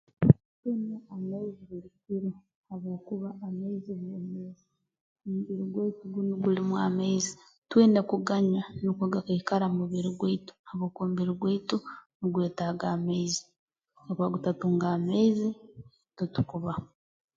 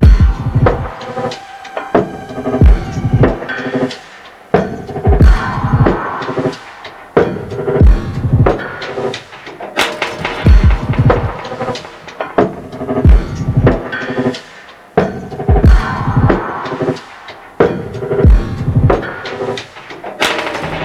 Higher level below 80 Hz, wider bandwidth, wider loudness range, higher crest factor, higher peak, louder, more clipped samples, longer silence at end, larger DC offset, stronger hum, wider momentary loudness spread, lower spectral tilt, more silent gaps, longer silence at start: second, -58 dBFS vs -16 dBFS; second, 7.8 kHz vs 12.5 kHz; first, 10 LU vs 2 LU; first, 26 dB vs 12 dB; second, -4 dBFS vs 0 dBFS; second, -30 LUFS vs -14 LUFS; neither; first, 0.5 s vs 0 s; neither; neither; about the same, 14 LU vs 15 LU; about the same, -6.5 dB/octave vs -7 dB/octave; first, 0.45-0.63 s, 2.55-2.64 s, 5.01-5.16 s, 7.58-7.62 s, 10.59-10.64 s, 12.15-12.20 s, 13.59-13.68 s vs none; first, 0.2 s vs 0 s